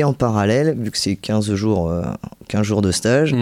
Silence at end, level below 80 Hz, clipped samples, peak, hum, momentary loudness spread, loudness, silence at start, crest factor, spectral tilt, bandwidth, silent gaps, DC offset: 0 s; -42 dBFS; under 0.1%; -4 dBFS; none; 8 LU; -19 LUFS; 0 s; 14 dB; -5.5 dB/octave; 16 kHz; none; under 0.1%